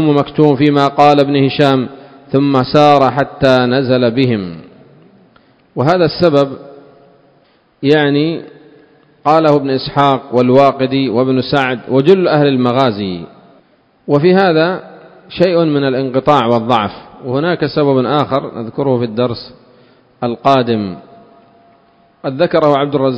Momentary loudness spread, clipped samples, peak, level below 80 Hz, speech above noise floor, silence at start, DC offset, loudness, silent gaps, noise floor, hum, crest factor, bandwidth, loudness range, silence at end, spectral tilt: 13 LU; 0.4%; 0 dBFS; -48 dBFS; 40 dB; 0 s; under 0.1%; -12 LUFS; none; -52 dBFS; none; 14 dB; 8 kHz; 6 LU; 0 s; -7.5 dB/octave